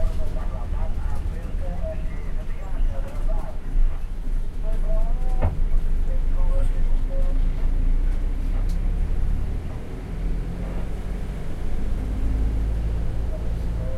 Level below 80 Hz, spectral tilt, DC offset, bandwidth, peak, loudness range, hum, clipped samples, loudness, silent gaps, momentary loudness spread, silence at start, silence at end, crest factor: -22 dBFS; -8 dB/octave; under 0.1%; 3.9 kHz; -8 dBFS; 4 LU; none; under 0.1%; -29 LUFS; none; 6 LU; 0 s; 0 s; 12 dB